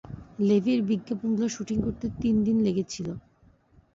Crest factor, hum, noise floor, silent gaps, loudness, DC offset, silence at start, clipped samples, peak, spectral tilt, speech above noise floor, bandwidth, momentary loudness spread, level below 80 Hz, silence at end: 14 dB; none; -60 dBFS; none; -27 LUFS; under 0.1%; 0.05 s; under 0.1%; -12 dBFS; -6.5 dB/octave; 35 dB; 7.8 kHz; 11 LU; -50 dBFS; 0.75 s